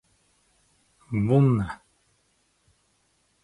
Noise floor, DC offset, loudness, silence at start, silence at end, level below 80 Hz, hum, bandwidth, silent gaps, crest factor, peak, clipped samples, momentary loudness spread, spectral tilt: -69 dBFS; under 0.1%; -24 LUFS; 1.1 s; 1.7 s; -54 dBFS; none; 11 kHz; none; 20 dB; -8 dBFS; under 0.1%; 15 LU; -9.5 dB/octave